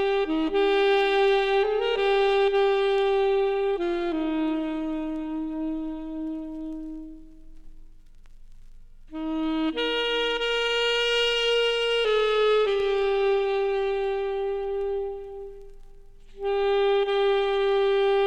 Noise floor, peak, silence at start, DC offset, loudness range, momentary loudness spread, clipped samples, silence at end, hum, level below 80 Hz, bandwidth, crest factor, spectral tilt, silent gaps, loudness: -46 dBFS; -12 dBFS; 0 s; under 0.1%; 12 LU; 12 LU; under 0.1%; 0 s; 50 Hz at -70 dBFS; -46 dBFS; 9.4 kHz; 14 dB; -3.5 dB/octave; none; -24 LUFS